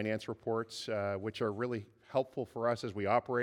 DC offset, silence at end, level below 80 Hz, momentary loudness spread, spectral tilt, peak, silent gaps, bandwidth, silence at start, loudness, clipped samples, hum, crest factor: under 0.1%; 0 s; -76 dBFS; 6 LU; -6 dB/octave; -18 dBFS; none; 15 kHz; 0 s; -36 LUFS; under 0.1%; none; 18 dB